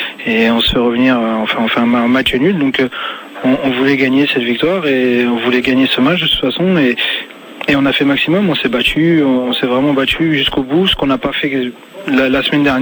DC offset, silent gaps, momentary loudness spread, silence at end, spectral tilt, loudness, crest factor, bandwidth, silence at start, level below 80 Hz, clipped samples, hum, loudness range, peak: under 0.1%; none; 5 LU; 0 s; -6 dB/octave; -13 LUFS; 12 dB; 19.5 kHz; 0 s; -38 dBFS; under 0.1%; none; 1 LU; -2 dBFS